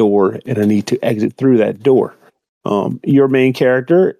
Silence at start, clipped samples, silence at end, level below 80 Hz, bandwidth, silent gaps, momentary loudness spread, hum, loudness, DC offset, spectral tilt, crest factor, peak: 0 s; under 0.1%; 0.1 s; -64 dBFS; 14 kHz; 2.49-2.61 s; 6 LU; none; -14 LUFS; under 0.1%; -7.5 dB/octave; 12 dB; -2 dBFS